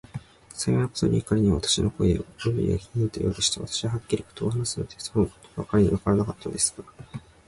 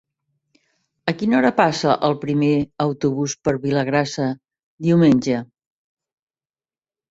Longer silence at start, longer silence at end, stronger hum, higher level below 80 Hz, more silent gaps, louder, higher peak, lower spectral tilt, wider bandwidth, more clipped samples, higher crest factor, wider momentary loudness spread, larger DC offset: second, 0.15 s vs 1.05 s; second, 0.25 s vs 1.65 s; neither; first, -42 dBFS vs -56 dBFS; second, none vs 4.63-4.78 s; second, -25 LUFS vs -19 LUFS; second, -10 dBFS vs -2 dBFS; about the same, -5 dB/octave vs -6 dB/octave; first, 11.5 kHz vs 8 kHz; neither; about the same, 16 dB vs 20 dB; first, 15 LU vs 10 LU; neither